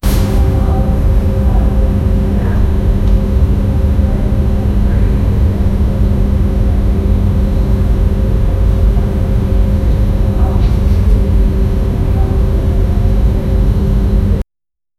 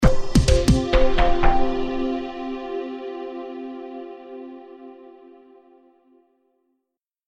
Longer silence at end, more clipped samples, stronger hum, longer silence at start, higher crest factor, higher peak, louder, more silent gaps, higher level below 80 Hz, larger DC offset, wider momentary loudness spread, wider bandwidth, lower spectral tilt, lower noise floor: second, 0.55 s vs 2.35 s; neither; neither; about the same, 0.05 s vs 0 s; second, 10 dB vs 18 dB; about the same, 0 dBFS vs -2 dBFS; first, -14 LUFS vs -23 LUFS; neither; first, -12 dBFS vs -26 dBFS; neither; second, 2 LU vs 21 LU; first, 13.5 kHz vs 10.5 kHz; first, -8.5 dB/octave vs -6 dB/octave; about the same, -84 dBFS vs -81 dBFS